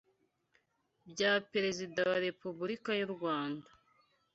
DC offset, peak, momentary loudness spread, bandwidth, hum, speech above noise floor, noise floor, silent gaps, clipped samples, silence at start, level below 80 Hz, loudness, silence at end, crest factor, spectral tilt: under 0.1%; -16 dBFS; 10 LU; 8 kHz; none; 43 dB; -78 dBFS; none; under 0.1%; 1.05 s; -78 dBFS; -35 LUFS; 0.75 s; 22 dB; -2.5 dB/octave